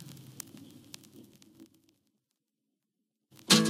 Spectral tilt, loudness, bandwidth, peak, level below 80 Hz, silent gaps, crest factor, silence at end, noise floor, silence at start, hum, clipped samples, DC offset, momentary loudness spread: -3 dB/octave; -31 LUFS; 16.5 kHz; -8 dBFS; -80 dBFS; none; 28 dB; 0 s; -85 dBFS; 0 s; none; under 0.1%; under 0.1%; 15 LU